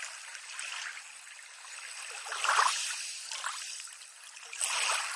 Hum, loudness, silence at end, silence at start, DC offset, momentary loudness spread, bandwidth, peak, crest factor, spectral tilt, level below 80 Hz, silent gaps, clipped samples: none; -33 LUFS; 0 s; 0 s; under 0.1%; 19 LU; 11.5 kHz; -12 dBFS; 24 dB; 7 dB/octave; under -90 dBFS; none; under 0.1%